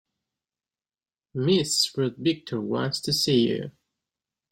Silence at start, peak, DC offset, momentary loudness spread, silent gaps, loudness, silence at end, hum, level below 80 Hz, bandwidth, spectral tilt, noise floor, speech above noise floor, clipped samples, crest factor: 1.35 s; -10 dBFS; under 0.1%; 10 LU; none; -24 LUFS; 0.8 s; none; -64 dBFS; 16.5 kHz; -4.5 dB/octave; under -90 dBFS; over 65 dB; under 0.1%; 18 dB